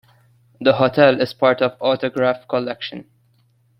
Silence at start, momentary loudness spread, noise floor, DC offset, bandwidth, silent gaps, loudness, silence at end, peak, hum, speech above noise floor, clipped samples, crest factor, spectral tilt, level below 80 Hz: 0.6 s; 14 LU; -59 dBFS; under 0.1%; 6.2 kHz; none; -18 LUFS; 0.8 s; 0 dBFS; none; 42 dB; under 0.1%; 18 dB; -7 dB/octave; -60 dBFS